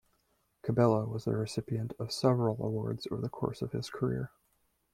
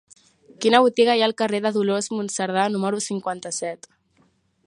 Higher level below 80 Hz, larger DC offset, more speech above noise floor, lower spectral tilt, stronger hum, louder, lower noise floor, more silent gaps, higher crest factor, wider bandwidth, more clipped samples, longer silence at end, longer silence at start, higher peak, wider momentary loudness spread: first, -62 dBFS vs -74 dBFS; neither; about the same, 43 dB vs 42 dB; first, -7 dB/octave vs -3.5 dB/octave; neither; second, -33 LUFS vs -21 LUFS; first, -75 dBFS vs -63 dBFS; neither; about the same, 22 dB vs 22 dB; first, 13.5 kHz vs 11.5 kHz; neither; second, 0.65 s vs 0.9 s; about the same, 0.65 s vs 0.6 s; second, -12 dBFS vs 0 dBFS; about the same, 9 LU vs 11 LU